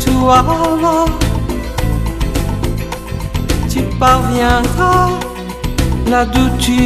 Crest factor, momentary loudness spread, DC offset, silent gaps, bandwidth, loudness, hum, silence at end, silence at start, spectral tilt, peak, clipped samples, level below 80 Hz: 14 dB; 10 LU; under 0.1%; none; 14.5 kHz; -14 LUFS; none; 0 s; 0 s; -5.5 dB/octave; 0 dBFS; under 0.1%; -20 dBFS